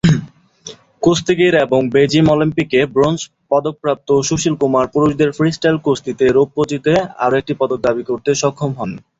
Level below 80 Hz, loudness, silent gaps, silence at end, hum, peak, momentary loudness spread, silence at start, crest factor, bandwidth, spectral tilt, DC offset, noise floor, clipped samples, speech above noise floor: -46 dBFS; -15 LUFS; none; 0.2 s; none; 0 dBFS; 7 LU; 0.05 s; 14 dB; 8 kHz; -5.5 dB/octave; under 0.1%; -38 dBFS; under 0.1%; 23 dB